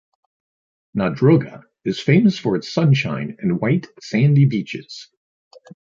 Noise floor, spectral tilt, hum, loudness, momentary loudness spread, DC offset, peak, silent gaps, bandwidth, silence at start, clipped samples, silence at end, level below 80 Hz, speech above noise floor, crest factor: under -90 dBFS; -7.5 dB/octave; none; -18 LUFS; 14 LU; under 0.1%; -2 dBFS; none; 7.4 kHz; 0.95 s; under 0.1%; 0.95 s; -56 dBFS; over 72 dB; 18 dB